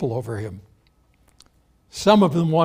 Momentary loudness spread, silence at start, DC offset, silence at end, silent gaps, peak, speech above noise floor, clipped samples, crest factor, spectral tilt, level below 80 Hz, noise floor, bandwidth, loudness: 19 LU; 0 s; under 0.1%; 0 s; none; -2 dBFS; 41 dB; under 0.1%; 20 dB; -6.5 dB/octave; -56 dBFS; -60 dBFS; 16 kHz; -20 LUFS